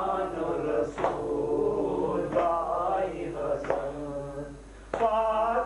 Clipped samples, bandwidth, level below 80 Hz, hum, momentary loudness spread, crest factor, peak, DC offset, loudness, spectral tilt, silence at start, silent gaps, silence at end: under 0.1%; 11 kHz; -50 dBFS; none; 10 LU; 18 dB; -10 dBFS; under 0.1%; -29 LUFS; -7 dB/octave; 0 s; none; 0 s